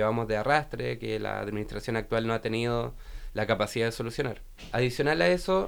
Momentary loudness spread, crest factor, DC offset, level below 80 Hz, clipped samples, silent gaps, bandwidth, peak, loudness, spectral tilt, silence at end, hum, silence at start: 10 LU; 20 dB; under 0.1%; -46 dBFS; under 0.1%; none; over 20 kHz; -8 dBFS; -29 LUFS; -5.5 dB/octave; 0 s; none; 0 s